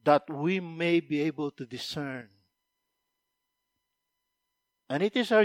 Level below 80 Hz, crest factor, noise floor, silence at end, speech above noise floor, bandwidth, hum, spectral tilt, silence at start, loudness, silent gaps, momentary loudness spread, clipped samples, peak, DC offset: -76 dBFS; 22 dB; -83 dBFS; 0 s; 55 dB; 15.5 kHz; none; -6 dB/octave; 0.05 s; -30 LUFS; none; 11 LU; under 0.1%; -8 dBFS; under 0.1%